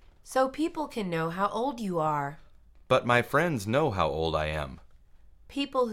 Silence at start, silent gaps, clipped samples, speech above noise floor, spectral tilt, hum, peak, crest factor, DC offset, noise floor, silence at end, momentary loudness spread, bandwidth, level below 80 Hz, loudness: 0.25 s; none; under 0.1%; 26 dB; -5.5 dB/octave; none; -8 dBFS; 20 dB; under 0.1%; -54 dBFS; 0 s; 10 LU; 16.5 kHz; -50 dBFS; -28 LUFS